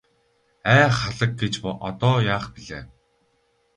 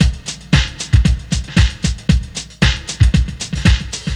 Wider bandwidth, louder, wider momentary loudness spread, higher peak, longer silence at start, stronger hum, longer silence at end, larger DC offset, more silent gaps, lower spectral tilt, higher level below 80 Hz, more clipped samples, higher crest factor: about the same, 10.5 kHz vs 11.5 kHz; second, -21 LUFS vs -16 LUFS; first, 19 LU vs 5 LU; about the same, -2 dBFS vs 0 dBFS; first, 0.65 s vs 0 s; neither; first, 0.9 s vs 0 s; neither; neither; about the same, -5.5 dB/octave vs -4.5 dB/octave; second, -48 dBFS vs -18 dBFS; neither; first, 20 dB vs 14 dB